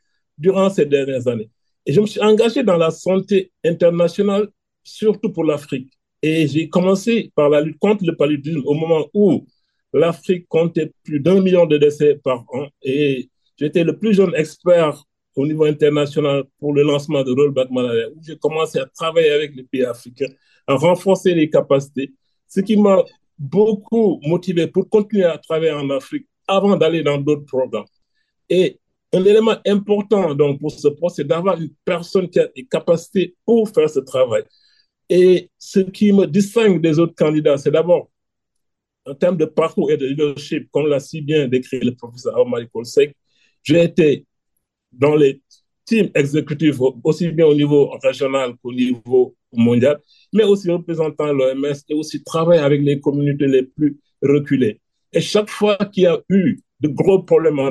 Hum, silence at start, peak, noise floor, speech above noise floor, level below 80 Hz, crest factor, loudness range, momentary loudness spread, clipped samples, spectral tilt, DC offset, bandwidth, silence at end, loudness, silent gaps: none; 0.4 s; -2 dBFS; -78 dBFS; 62 dB; -62 dBFS; 14 dB; 3 LU; 9 LU; under 0.1%; -7 dB/octave; under 0.1%; 12.5 kHz; 0 s; -17 LUFS; none